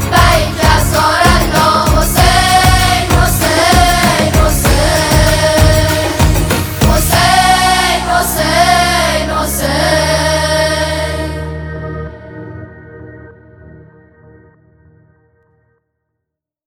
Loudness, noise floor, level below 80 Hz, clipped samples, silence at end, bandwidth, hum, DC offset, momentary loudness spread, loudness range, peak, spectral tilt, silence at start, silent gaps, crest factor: -10 LUFS; -77 dBFS; -20 dBFS; under 0.1%; 2.95 s; over 20 kHz; none; under 0.1%; 13 LU; 12 LU; 0 dBFS; -4 dB/octave; 0 s; none; 12 dB